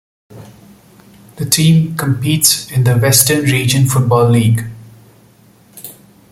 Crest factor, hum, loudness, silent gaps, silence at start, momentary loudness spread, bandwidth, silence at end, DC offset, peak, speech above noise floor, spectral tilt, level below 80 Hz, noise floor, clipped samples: 14 dB; none; -12 LUFS; none; 0.35 s; 21 LU; 17 kHz; 0.4 s; under 0.1%; 0 dBFS; 35 dB; -4.5 dB/octave; -46 dBFS; -46 dBFS; under 0.1%